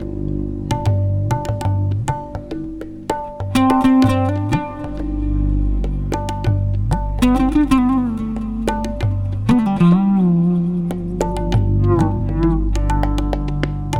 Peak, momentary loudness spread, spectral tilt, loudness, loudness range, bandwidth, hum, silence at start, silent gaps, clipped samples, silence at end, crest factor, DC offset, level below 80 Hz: -2 dBFS; 10 LU; -7.5 dB/octave; -18 LUFS; 4 LU; 16 kHz; none; 0 s; none; under 0.1%; 0 s; 14 dB; under 0.1%; -24 dBFS